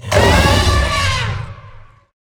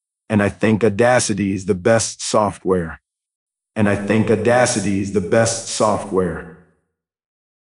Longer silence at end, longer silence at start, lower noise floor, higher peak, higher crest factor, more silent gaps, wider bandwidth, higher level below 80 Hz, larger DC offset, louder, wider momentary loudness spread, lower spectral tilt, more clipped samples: second, 0.45 s vs 1.25 s; second, 0.05 s vs 0.3 s; second, -39 dBFS vs -71 dBFS; about the same, 0 dBFS vs -2 dBFS; about the same, 16 dB vs 16 dB; second, none vs 3.35-3.46 s; first, over 20 kHz vs 11 kHz; first, -22 dBFS vs -50 dBFS; neither; first, -14 LUFS vs -18 LUFS; first, 14 LU vs 6 LU; about the same, -4.5 dB/octave vs -5 dB/octave; neither